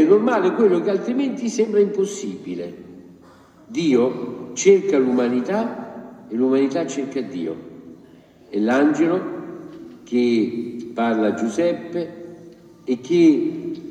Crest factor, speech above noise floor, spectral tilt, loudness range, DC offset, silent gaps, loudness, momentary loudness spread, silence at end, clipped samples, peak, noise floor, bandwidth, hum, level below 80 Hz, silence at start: 18 dB; 29 dB; -5.5 dB/octave; 3 LU; under 0.1%; none; -20 LUFS; 18 LU; 0 s; under 0.1%; -2 dBFS; -48 dBFS; 9.4 kHz; none; -68 dBFS; 0 s